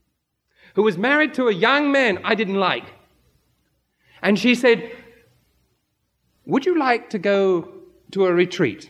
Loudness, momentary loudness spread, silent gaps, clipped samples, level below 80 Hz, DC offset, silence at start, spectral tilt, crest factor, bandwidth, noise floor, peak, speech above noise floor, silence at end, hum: -19 LUFS; 8 LU; none; under 0.1%; -68 dBFS; under 0.1%; 0.75 s; -5.5 dB/octave; 20 dB; 12.5 kHz; -73 dBFS; -2 dBFS; 54 dB; 0.05 s; none